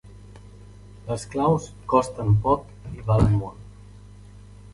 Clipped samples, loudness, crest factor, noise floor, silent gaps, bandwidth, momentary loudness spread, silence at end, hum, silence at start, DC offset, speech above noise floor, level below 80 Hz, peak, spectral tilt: under 0.1%; -23 LUFS; 22 dB; -45 dBFS; none; 11.5 kHz; 18 LU; 0.2 s; 50 Hz at -40 dBFS; 0.05 s; under 0.1%; 23 dB; -40 dBFS; -4 dBFS; -8 dB/octave